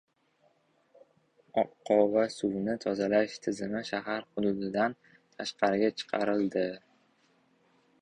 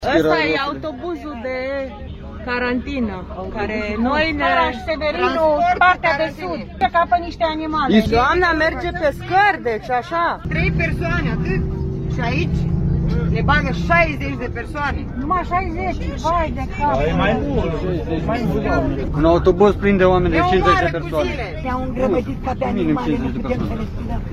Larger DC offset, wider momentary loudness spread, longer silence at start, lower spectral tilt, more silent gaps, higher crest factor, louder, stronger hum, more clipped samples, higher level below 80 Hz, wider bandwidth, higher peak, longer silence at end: neither; about the same, 8 LU vs 10 LU; first, 1.55 s vs 0 s; second, -5.5 dB/octave vs -7 dB/octave; neither; about the same, 22 dB vs 18 dB; second, -30 LUFS vs -19 LUFS; neither; neither; second, -68 dBFS vs -28 dBFS; second, 10.5 kHz vs 13.5 kHz; second, -10 dBFS vs 0 dBFS; first, 1.25 s vs 0 s